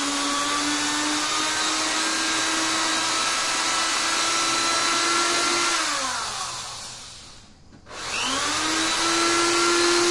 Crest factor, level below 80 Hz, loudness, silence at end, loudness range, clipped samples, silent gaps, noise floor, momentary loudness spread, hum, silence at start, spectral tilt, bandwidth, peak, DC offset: 16 dB; -54 dBFS; -21 LUFS; 0 s; 5 LU; under 0.1%; none; -48 dBFS; 10 LU; none; 0 s; -0.5 dB/octave; 11.5 kHz; -8 dBFS; under 0.1%